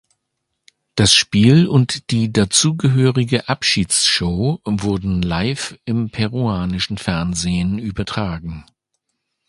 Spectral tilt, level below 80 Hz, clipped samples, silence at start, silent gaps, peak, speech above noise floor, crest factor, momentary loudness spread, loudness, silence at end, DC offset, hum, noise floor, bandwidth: -4.5 dB/octave; -38 dBFS; under 0.1%; 0.95 s; none; 0 dBFS; 58 dB; 18 dB; 11 LU; -17 LUFS; 0.85 s; under 0.1%; none; -75 dBFS; 11.5 kHz